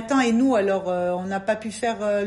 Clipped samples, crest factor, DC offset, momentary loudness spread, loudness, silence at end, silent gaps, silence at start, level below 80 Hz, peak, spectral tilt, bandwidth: under 0.1%; 14 dB; under 0.1%; 7 LU; -23 LUFS; 0 s; none; 0 s; -60 dBFS; -8 dBFS; -5.5 dB/octave; 11.5 kHz